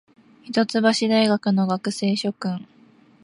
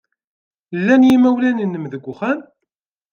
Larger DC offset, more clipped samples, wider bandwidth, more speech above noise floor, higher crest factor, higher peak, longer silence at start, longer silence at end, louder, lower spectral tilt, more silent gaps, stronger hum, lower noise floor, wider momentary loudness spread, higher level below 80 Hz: neither; neither; first, 11.5 kHz vs 6.8 kHz; second, 32 dB vs 63 dB; about the same, 18 dB vs 14 dB; about the same, -4 dBFS vs -2 dBFS; second, 0.45 s vs 0.7 s; about the same, 0.6 s vs 0.7 s; second, -21 LUFS vs -16 LUFS; second, -5.5 dB/octave vs -7 dB/octave; neither; neither; second, -53 dBFS vs -78 dBFS; second, 10 LU vs 16 LU; second, -70 dBFS vs -60 dBFS